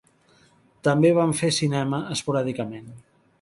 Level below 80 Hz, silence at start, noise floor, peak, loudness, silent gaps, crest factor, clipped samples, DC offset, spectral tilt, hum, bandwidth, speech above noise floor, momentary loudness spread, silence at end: -62 dBFS; 0.85 s; -59 dBFS; -6 dBFS; -23 LUFS; none; 18 dB; under 0.1%; under 0.1%; -5.5 dB/octave; none; 11.5 kHz; 36 dB; 13 LU; 0.4 s